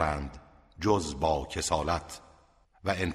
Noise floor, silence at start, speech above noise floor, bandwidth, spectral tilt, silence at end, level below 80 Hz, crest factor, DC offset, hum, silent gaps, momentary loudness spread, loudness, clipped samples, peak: -62 dBFS; 0 s; 32 dB; 15 kHz; -4.5 dB/octave; 0 s; -44 dBFS; 20 dB; under 0.1%; none; none; 14 LU; -30 LUFS; under 0.1%; -12 dBFS